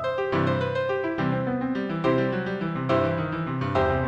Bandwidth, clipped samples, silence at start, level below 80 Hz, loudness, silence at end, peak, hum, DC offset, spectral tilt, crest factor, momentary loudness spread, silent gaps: 8.2 kHz; under 0.1%; 0 s; -48 dBFS; -26 LUFS; 0 s; -8 dBFS; none; under 0.1%; -8.5 dB/octave; 16 dB; 4 LU; none